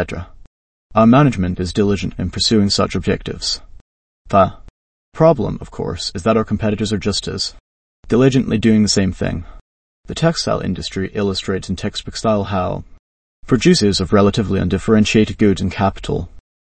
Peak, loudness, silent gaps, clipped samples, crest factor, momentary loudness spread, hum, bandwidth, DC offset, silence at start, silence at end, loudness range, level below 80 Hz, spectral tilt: 0 dBFS; -17 LUFS; 0.47-0.90 s, 3.81-4.25 s, 4.70-5.12 s, 7.60-8.03 s, 9.61-10.04 s, 12.99-13.43 s; under 0.1%; 16 dB; 11 LU; none; 8.8 kHz; under 0.1%; 0 s; 0.4 s; 5 LU; -36 dBFS; -5.5 dB/octave